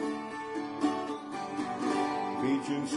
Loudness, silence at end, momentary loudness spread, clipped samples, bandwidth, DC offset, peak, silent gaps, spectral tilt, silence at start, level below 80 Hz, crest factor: -33 LUFS; 0 s; 7 LU; under 0.1%; 11 kHz; under 0.1%; -16 dBFS; none; -5 dB/octave; 0 s; -72 dBFS; 16 dB